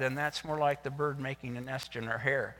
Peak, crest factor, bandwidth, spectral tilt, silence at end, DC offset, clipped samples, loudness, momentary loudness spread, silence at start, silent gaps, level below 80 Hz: -16 dBFS; 18 dB; 19 kHz; -5.5 dB/octave; 0 s; under 0.1%; under 0.1%; -34 LUFS; 7 LU; 0 s; none; -64 dBFS